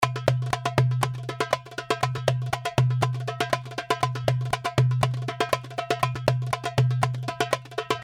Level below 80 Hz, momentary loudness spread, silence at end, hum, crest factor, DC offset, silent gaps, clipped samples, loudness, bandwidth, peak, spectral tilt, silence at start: -52 dBFS; 5 LU; 0 s; none; 22 dB; under 0.1%; none; under 0.1%; -26 LUFS; 15 kHz; -4 dBFS; -5.5 dB/octave; 0 s